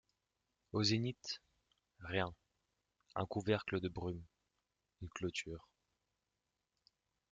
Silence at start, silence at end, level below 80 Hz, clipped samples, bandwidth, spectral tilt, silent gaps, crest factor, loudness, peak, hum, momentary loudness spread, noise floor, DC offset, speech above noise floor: 0.75 s; 1.7 s; -68 dBFS; under 0.1%; 8.8 kHz; -5 dB/octave; none; 24 dB; -41 LUFS; -20 dBFS; none; 16 LU; -89 dBFS; under 0.1%; 49 dB